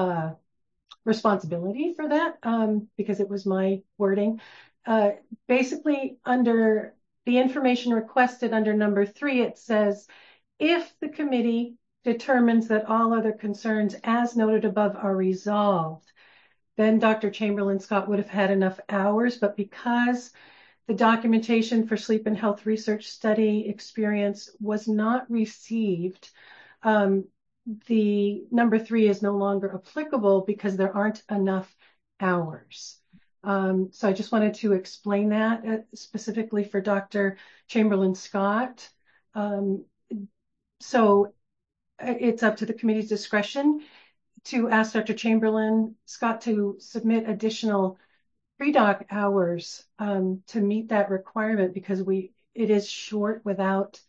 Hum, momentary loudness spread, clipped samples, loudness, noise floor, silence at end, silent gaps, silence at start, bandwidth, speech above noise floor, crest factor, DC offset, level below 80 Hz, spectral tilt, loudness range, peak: none; 10 LU; under 0.1%; -25 LUFS; -80 dBFS; 0.1 s; none; 0 s; 7.6 kHz; 55 dB; 18 dB; under 0.1%; -76 dBFS; -6.5 dB/octave; 3 LU; -8 dBFS